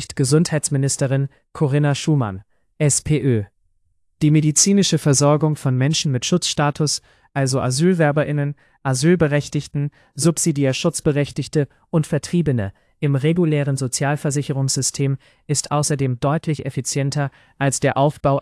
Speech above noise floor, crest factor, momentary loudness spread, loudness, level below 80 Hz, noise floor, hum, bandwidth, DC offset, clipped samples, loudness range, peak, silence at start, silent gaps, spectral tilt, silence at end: 46 dB; 16 dB; 8 LU; -19 LUFS; -50 dBFS; -65 dBFS; none; 12 kHz; under 0.1%; under 0.1%; 4 LU; -4 dBFS; 0 s; none; -5 dB/octave; 0 s